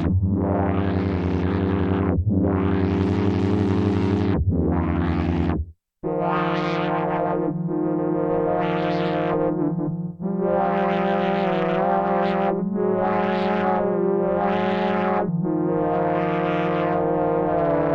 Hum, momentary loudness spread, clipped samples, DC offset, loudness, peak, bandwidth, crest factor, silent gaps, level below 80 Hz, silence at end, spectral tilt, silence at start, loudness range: none; 3 LU; under 0.1%; under 0.1%; -22 LUFS; -8 dBFS; 6.6 kHz; 14 dB; none; -42 dBFS; 0 s; -9.5 dB/octave; 0 s; 2 LU